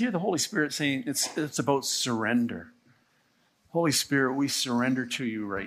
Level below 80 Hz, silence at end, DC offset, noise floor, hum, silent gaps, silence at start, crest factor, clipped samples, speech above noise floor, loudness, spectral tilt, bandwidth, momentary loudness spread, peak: -68 dBFS; 0 s; under 0.1%; -68 dBFS; none; none; 0 s; 18 dB; under 0.1%; 40 dB; -27 LUFS; -3.5 dB/octave; 15 kHz; 6 LU; -10 dBFS